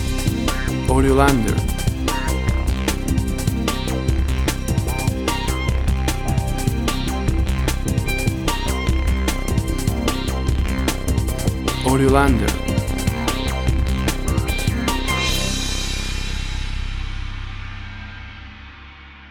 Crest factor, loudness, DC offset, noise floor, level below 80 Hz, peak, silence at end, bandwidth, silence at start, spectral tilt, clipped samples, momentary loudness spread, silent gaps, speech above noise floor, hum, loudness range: 18 dB; -21 LUFS; under 0.1%; -40 dBFS; -24 dBFS; -2 dBFS; 0 s; 19.5 kHz; 0 s; -5 dB/octave; under 0.1%; 13 LU; none; 25 dB; none; 4 LU